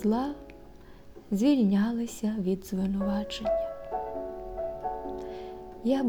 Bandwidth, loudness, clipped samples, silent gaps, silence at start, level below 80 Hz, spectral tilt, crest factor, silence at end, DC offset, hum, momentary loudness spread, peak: 19.5 kHz; -30 LUFS; under 0.1%; none; 0 s; -50 dBFS; -7 dB/octave; 16 dB; 0 s; under 0.1%; none; 14 LU; -14 dBFS